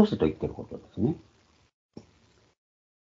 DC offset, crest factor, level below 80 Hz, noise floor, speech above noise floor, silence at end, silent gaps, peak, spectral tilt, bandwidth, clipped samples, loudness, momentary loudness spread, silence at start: under 0.1%; 26 dB; -54 dBFS; -63 dBFS; 36 dB; 1 s; 1.74-1.89 s; -6 dBFS; -9 dB/octave; 7.6 kHz; under 0.1%; -30 LUFS; 25 LU; 0 s